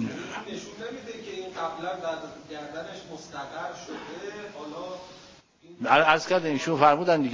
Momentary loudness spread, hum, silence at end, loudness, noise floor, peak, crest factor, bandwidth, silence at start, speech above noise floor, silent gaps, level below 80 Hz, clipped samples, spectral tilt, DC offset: 19 LU; none; 0 s; -27 LUFS; -53 dBFS; -4 dBFS; 24 dB; 7.6 kHz; 0 s; 26 dB; none; -66 dBFS; under 0.1%; -4.5 dB/octave; under 0.1%